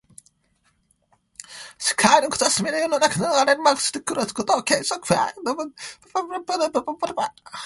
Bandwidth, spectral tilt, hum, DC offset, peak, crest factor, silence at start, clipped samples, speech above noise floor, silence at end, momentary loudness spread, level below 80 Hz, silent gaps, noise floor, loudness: 12 kHz; -2.5 dB/octave; none; under 0.1%; -2 dBFS; 22 dB; 1.4 s; under 0.1%; 44 dB; 0 s; 12 LU; -62 dBFS; none; -66 dBFS; -21 LUFS